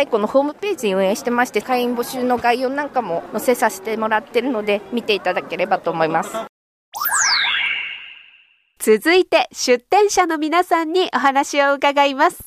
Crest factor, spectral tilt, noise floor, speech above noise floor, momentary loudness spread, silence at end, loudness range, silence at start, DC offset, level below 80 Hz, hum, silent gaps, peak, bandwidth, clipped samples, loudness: 16 dB; -2.5 dB/octave; -54 dBFS; 36 dB; 8 LU; 0 s; 4 LU; 0 s; under 0.1%; -60 dBFS; none; 6.49-6.92 s; -4 dBFS; 15.5 kHz; under 0.1%; -18 LUFS